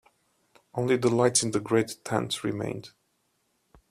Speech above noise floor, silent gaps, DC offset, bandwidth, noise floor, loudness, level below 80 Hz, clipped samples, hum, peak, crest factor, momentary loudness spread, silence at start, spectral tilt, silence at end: 47 dB; none; under 0.1%; 14.5 kHz; -73 dBFS; -27 LUFS; -64 dBFS; under 0.1%; none; -8 dBFS; 20 dB; 12 LU; 0.75 s; -4 dB/octave; 1 s